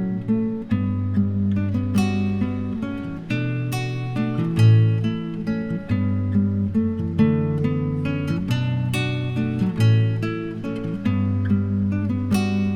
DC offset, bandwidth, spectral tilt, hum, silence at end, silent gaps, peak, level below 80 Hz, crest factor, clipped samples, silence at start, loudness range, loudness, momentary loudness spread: under 0.1%; 13 kHz; -8 dB/octave; none; 0 s; none; -6 dBFS; -48 dBFS; 14 dB; under 0.1%; 0 s; 2 LU; -22 LUFS; 8 LU